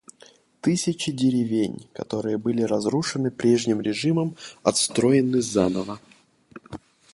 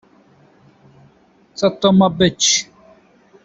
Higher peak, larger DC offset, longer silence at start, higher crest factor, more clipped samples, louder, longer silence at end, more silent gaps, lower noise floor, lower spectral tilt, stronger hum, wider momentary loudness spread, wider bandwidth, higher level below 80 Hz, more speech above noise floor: about the same, -4 dBFS vs -2 dBFS; neither; second, 0.65 s vs 1.6 s; about the same, 20 dB vs 18 dB; neither; second, -23 LUFS vs -15 LUFS; second, 0.4 s vs 0.8 s; neither; about the same, -54 dBFS vs -53 dBFS; about the same, -5 dB/octave vs -4 dB/octave; neither; about the same, 15 LU vs 17 LU; first, 11.5 kHz vs 8 kHz; second, -58 dBFS vs -52 dBFS; second, 31 dB vs 38 dB